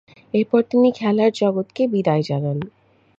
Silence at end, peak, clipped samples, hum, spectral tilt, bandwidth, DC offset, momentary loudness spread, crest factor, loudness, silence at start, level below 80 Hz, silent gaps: 0.5 s; -4 dBFS; under 0.1%; none; -8 dB/octave; 7.8 kHz; under 0.1%; 8 LU; 16 dB; -20 LUFS; 0.35 s; -62 dBFS; none